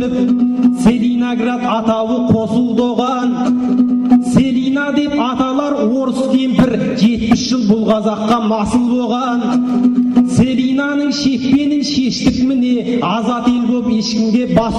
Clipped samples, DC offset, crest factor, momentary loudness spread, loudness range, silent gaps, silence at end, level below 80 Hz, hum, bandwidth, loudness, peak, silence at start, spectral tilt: under 0.1%; under 0.1%; 10 dB; 3 LU; 1 LU; none; 0 s; -40 dBFS; none; 11 kHz; -14 LUFS; -2 dBFS; 0 s; -6 dB/octave